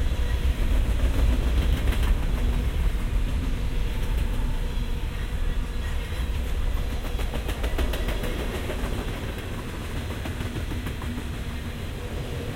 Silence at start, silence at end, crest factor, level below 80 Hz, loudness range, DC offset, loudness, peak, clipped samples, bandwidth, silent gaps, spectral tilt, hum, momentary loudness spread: 0 s; 0 s; 14 dB; -26 dBFS; 5 LU; under 0.1%; -29 LUFS; -10 dBFS; under 0.1%; 16 kHz; none; -6 dB/octave; none; 7 LU